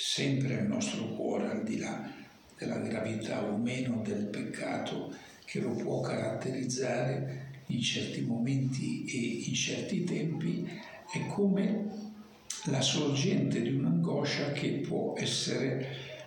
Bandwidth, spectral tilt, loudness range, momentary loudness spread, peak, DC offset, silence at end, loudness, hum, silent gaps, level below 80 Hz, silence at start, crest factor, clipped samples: 17 kHz; -5 dB/octave; 4 LU; 11 LU; -18 dBFS; under 0.1%; 0 s; -33 LUFS; none; none; -72 dBFS; 0 s; 16 dB; under 0.1%